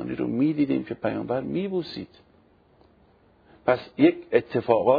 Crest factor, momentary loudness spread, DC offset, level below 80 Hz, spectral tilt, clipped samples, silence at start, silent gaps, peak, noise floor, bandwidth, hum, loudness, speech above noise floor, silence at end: 20 dB; 9 LU; under 0.1%; -62 dBFS; -9.5 dB/octave; under 0.1%; 0 s; none; -6 dBFS; -59 dBFS; 5 kHz; none; -25 LUFS; 35 dB; 0 s